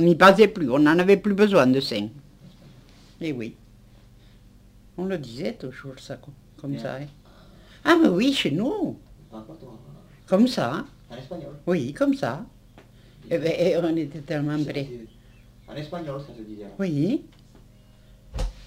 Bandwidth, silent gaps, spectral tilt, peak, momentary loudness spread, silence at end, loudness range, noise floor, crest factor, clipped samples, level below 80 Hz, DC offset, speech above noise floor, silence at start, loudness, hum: 16 kHz; none; -6.5 dB/octave; -2 dBFS; 22 LU; 0.05 s; 12 LU; -51 dBFS; 22 dB; under 0.1%; -46 dBFS; under 0.1%; 29 dB; 0 s; -23 LUFS; 50 Hz at -55 dBFS